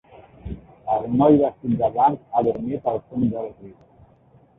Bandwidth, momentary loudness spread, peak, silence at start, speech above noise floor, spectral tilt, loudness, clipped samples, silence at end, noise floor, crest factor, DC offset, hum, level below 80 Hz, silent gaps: 3.9 kHz; 20 LU; -4 dBFS; 0.45 s; 34 dB; -12 dB/octave; -21 LUFS; under 0.1%; 0.85 s; -54 dBFS; 20 dB; under 0.1%; none; -48 dBFS; none